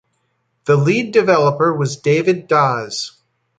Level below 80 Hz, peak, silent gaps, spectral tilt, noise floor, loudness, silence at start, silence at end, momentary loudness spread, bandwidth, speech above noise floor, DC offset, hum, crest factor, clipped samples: -60 dBFS; -2 dBFS; none; -6 dB/octave; -67 dBFS; -16 LUFS; 0.65 s; 0.5 s; 11 LU; 9.2 kHz; 52 dB; under 0.1%; none; 16 dB; under 0.1%